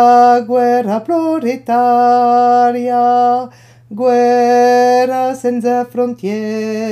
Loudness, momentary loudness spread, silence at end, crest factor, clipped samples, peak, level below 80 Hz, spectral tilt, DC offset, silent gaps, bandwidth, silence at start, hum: -12 LUFS; 9 LU; 0 s; 12 dB; under 0.1%; 0 dBFS; -64 dBFS; -5.5 dB/octave; under 0.1%; none; 13 kHz; 0 s; none